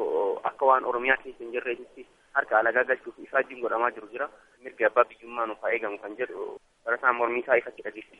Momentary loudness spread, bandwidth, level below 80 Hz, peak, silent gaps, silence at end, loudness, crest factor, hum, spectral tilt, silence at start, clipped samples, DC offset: 14 LU; 5.2 kHz; -68 dBFS; -6 dBFS; none; 0.15 s; -27 LUFS; 22 dB; none; -5.5 dB/octave; 0 s; under 0.1%; under 0.1%